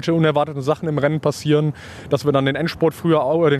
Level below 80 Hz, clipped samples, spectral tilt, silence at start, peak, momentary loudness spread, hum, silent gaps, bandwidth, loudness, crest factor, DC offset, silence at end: -52 dBFS; under 0.1%; -7 dB/octave; 0 s; -4 dBFS; 5 LU; none; none; 14 kHz; -19 LUFS; 14 dB; under 0.1%; 0 s